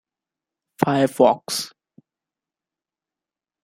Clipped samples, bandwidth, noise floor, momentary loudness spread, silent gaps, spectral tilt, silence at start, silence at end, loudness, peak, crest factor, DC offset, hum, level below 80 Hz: under 0.1%; 16 kHz; -90 dBFS; 10 LU; none; -5 dB/octave; 0.8 s; 1.95 s; -20 LUFS; -2 dBFS; 22 dB; under 0.1%; none; -68 dBFS